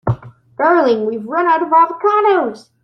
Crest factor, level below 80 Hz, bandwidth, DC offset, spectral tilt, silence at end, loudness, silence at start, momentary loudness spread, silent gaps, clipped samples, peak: 14 dB; -50 dBFS; 9 kHz; under 0.1%; -8 dB/octave; 0.25 s; -14 LUFS; 0.05 s; 9 LU; none; under 0.1%; -2 dBFS